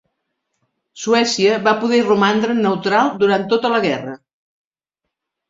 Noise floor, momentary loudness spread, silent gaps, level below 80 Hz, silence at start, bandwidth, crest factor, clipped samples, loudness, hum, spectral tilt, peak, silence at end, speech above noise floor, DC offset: -80 dBFS; 6 LU; none; -62 dBFS; 0.95 s; 7.8 kHz; 16 dB; under 0.1%; -16 LUFS; none; -4.5 dB/octave; -2 dBFS; 1.35 s; 65 dB; under 0.1%